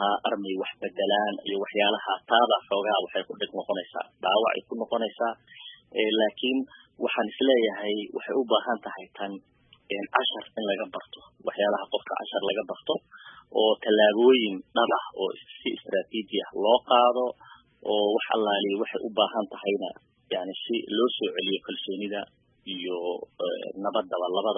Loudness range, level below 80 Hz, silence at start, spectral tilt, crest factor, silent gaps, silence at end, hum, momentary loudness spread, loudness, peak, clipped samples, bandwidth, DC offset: 6 LU; -76 dBFS; 0 s; -8 dB/octave; 24 dB; none; 0 s; none; 13 LU; -27 LUFS; -4 dBFS; under 0.1%; 3.8 kHz; under 0.1%